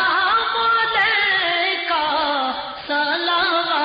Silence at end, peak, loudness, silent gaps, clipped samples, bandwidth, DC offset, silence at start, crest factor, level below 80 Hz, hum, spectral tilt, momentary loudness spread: 0 s; -8 dBFS; -18 LUFS; none; under 0.1%; 5.2 kHz; under 0.1%; 0 s; 10 dB; -56 dBFS; none; 2.5 dB/octave; 6 LU